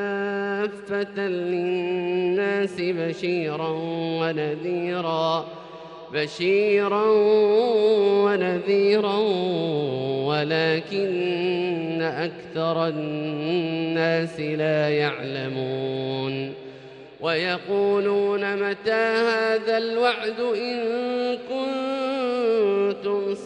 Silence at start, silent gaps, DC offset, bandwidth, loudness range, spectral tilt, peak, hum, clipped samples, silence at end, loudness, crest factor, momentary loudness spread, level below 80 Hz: 0 s; none; under 0.1%; 9 kHz; 6 LU; -6.5 dB/octave; -10 dBFS; none; under 0.1%; 0 s; -23 LUFS; 14 dB; 8 LU; -70 dBFS